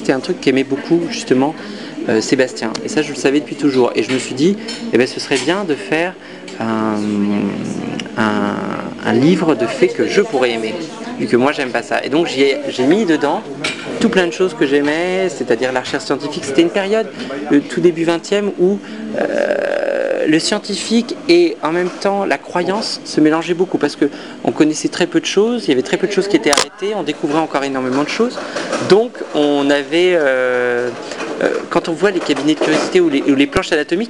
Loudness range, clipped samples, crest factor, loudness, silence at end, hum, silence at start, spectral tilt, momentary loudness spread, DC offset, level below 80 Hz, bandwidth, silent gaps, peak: 2 LU; under 0.1%; 16 dB; -16 LUFS; 0 s; none; 0 s; -4.5 dB/octave; 7 LU; 0.3%; -52 dBFS; 11.5 kHz; none; 0 dBFS